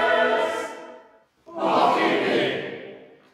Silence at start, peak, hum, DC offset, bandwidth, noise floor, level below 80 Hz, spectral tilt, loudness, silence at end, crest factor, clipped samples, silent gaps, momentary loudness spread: 0 s; -8 dBFS; none; under 0.1%; 14.5 kHz; -54 dBFS; -70 dBFS; -4.5 dB/octave; -22 LUFS; 0.3 s; 16 dB; under 0.1%; none; 20 LU